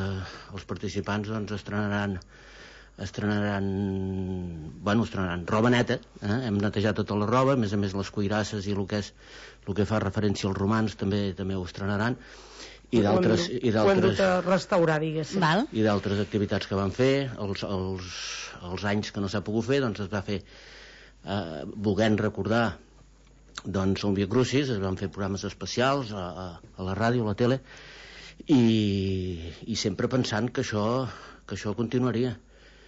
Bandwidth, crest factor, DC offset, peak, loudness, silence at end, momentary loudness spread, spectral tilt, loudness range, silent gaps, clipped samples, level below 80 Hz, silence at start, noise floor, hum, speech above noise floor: 8 kHz; 16 dB; under 0.1%; -12 dBFS; -27 LUFS; 0.2 s; 16 LU; -6 dB/octave; 6 LU; none; under 0.1%; -54 dBFS; 0 s; -54 dBFS; none; 28 dB